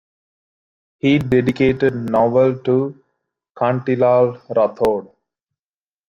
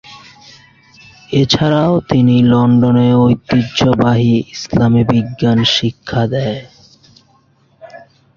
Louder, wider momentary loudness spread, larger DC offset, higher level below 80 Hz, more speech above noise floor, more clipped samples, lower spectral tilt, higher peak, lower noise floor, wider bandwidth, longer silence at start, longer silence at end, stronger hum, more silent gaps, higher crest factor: second, -17 LUFS vs -13 LUFS; about the same, 6 LU vs 8 LU; neither; second, -50 dBFS vs -42 dBFS; first, over 74 dB vs 41 dB; neither; first, -8.5 dB/octave vs -6.5 dB/octave; second, -4 dBFS vs 0 dBFS; first, under -90 dBFS vs -53 dBFS; first, 9 kHz vs 7.2 kHz; first, 1.05 s vs 0.1 s; first, 1.05 s vs 0.4 s; neither; first, 3.51-3.55 s vs none; about the same, 16 dB vs 14 dB